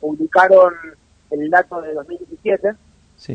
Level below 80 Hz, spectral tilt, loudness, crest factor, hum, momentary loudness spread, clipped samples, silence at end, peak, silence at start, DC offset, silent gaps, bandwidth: -58 dBFS; -6.5 dB/octave; -15 LUFS; 16 dB; none; 17 LU; under 0.1%; 0 s; 0 dBFS; 0 s; under 0.1%; none; 8.4 kHz